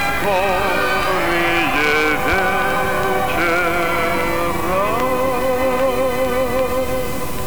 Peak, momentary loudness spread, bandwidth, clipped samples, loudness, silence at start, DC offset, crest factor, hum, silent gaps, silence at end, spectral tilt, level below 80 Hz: -4 dBFS; 4 LU; over 20 kHz; under 0.1%; -17 LUFS; 0 s; 5%; 14 dB; none; none; 0 s; -4 dB/octave; -36 dBFS